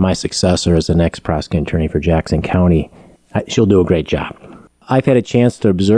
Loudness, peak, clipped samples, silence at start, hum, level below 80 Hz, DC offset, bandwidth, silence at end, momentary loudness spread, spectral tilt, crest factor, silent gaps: -15 LUFS; -2 dBFS; under 0.1%; 0 s; none; -30 dBFS; under 0.1%; 11 kHz; 0 s; 8 LU; -6.5 dB/octave; 14 dB; none